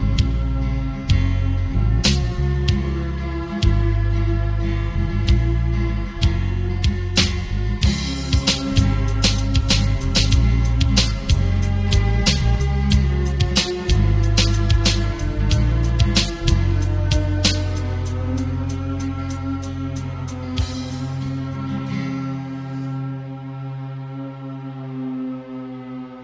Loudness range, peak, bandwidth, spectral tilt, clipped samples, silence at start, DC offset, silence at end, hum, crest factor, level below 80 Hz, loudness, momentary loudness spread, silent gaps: 9 LU; -2 dBFS; 8 kHz; -5 dB/octave; under 0.1%; 0 s; under 0.1%; 0 s; none; 18 dB; -22 dBFS; -21 LUFS; 11 LU; none